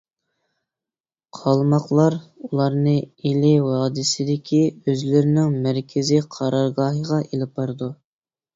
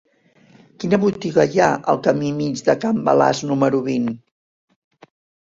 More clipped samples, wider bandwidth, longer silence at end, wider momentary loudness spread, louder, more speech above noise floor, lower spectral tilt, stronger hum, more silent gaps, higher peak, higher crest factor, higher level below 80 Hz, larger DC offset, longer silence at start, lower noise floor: neither; about the same, 7.8 kHz vs 7.8 kHz; second, 0.6 s vs 1.25 s; about the same, 9 LU vs 7 LU; about the same, -20 LUFS vs -19 LUFS; first, over 70 dB vs 35 dB; about the same, -6.5 dB/octave vs -6 dB/octave; neither; neither; about the same, -4 dBFS vs -2 dBFS; about the same, 16 dB vs 18 dB; about the same, -58 dBFS vs -58 dBFS; neither; first, 1.35 s vs 0.8 s; first, under -90 dBFS vs -53 dBFS